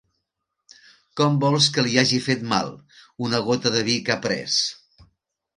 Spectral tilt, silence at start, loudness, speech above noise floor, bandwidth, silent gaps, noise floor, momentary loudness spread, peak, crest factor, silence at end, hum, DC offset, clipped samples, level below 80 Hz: -4 dB/octave; 1.15 s; -21 LUFS; 58 dB; 11 kHz; none; -80 dBFS; 8 LU; 0 dBFS; 22 dB; 0.85 s; none; under 0.1%; under 0.1%; -62 dBFS